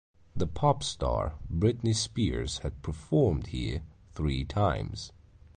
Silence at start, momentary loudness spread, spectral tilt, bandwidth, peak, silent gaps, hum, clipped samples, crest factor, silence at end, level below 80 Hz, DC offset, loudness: 0.35 s; 13 LU; -6 dB/octave; 10 kHz; -12 dBFS; none; none; under 0.1%; 18 dB; 0.5 s; -40 dBFS; under 0.1%; -30 LUFS